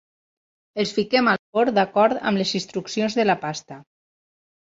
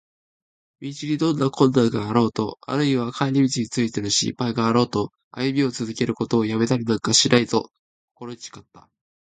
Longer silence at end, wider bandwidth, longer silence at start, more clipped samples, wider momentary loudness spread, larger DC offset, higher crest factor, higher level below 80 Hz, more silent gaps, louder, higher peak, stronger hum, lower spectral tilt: first, 0.9 s vs 0.45 s; second, 7.8 kHz vs 9.4 kHz; about the same, 0.75 s vs 0.8 s; neither; second, 9 LU vs 17 LU; neither; about the same, 18 dB vs 22 dB; second, -64 dBFS vs -58 dBFS; second, 1.39-1.53 s vs 5.24-5.31 s, 7.79-8.15 s; about the same, -21 LUFS vs -21 LUFS; second, -4 dBFS vs 0 dBFS; neither; about the same, -4.5 dB/octave vs -4.5 dB/octave